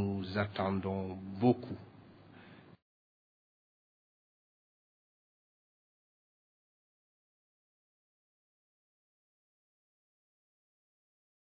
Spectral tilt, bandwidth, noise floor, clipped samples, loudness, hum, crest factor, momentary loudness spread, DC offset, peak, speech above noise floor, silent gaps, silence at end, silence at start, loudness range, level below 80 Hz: -6.5 dB/octave; 5 kHz; -57 dBFS; under 0.1%; -35 LUFS; none; 26 dB; 25 LU; under 0.1%; -16 dBFS; 23 dB; none; 8.7 s; 0 s; 11 LU; -76 dBFS